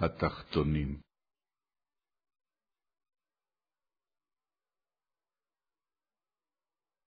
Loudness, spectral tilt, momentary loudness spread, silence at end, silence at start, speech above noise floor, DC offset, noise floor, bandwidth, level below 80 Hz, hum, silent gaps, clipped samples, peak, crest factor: -33 LUFS; -6.5 dB/octave; 9 LU; 6.05 s; 0 s; over 58 dB; under 0.1%; under -90 dBFS; 5 kHz; -52 dBFS; none; none; under 0.1%; -16 dBFS; 26 dB